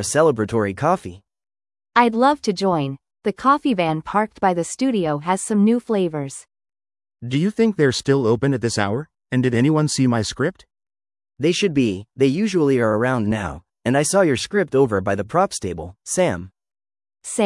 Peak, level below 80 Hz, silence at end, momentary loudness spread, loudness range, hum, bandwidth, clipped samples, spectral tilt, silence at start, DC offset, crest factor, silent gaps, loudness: 0 dBFS; -54 dBFS; 0 s; 10 LU; 2 LU; none; 12 kHz; under 0.1%; -5.5 dB/octave; 0 s; under 0.1%; 20 dB; none; -20 LUFS